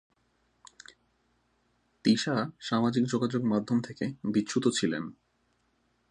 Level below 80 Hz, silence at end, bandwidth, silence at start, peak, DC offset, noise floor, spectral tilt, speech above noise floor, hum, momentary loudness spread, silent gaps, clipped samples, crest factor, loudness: -70 dBFS; 1 s; 10 kHz; 2.05 s; -12 dBFS; under 0.1%; -73 dBFS; -5 dB/octave; 44 dB; none; 7 LU; none; under 0.1%; 20 dB; -29 LUFS